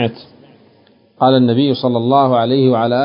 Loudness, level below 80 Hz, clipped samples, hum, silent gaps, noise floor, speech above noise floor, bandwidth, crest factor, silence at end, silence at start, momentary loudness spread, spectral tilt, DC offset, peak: -13 LUFS; -58 dBFS; under 0.1%; none; none; -51 dBFS; 38 dB; 5.4 kHz; 14 dB; 0 s; 0 s; 4 LU; -11.5 dB/octave; under 0.1%; 0 dBFS